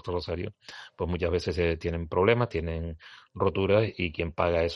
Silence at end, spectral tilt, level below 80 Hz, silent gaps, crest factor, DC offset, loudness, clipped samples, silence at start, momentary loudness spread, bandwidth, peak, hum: 0 s; -7 dB/octave; -48 dBFS; none; 20 dB; under 0.1%; -28 LUFS; under 0.1%; 0.05 s; 15 LU; 11.5 kHz; -8 dBFS; none